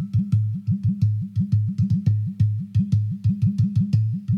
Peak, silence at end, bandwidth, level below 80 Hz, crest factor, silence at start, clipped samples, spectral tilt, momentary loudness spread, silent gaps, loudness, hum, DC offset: -8 dBFS; 0 s; 5.6 kHz; -50 dBFS; 12 dB; 0 s; under 0.1%; -10 dB/octave; 3 LU; none; -22 LUFS; none; under 0.1%